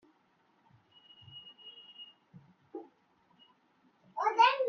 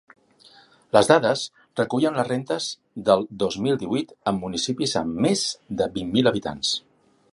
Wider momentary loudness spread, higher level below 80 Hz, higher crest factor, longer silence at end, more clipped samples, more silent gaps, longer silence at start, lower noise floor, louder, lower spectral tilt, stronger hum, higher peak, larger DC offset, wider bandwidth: first, 25 LU vs 9 LU; second, -90 dBFS vs -56 dBFS; about the same, 24 dB vs 24 dB; second, 0 s vs 0.55 s; neither; neither; first, 1.35 s vs 0.95 s; first, -71 dBFS vs -54 dBFS; second, -29 LUFS vs -23 LUFS; second, 1 dB/octave vs -4.5 dB/octave; neither; second, -12 dBFS vs 0 dBFS; neither; second, 6.8 kHz vs 11.5 kHz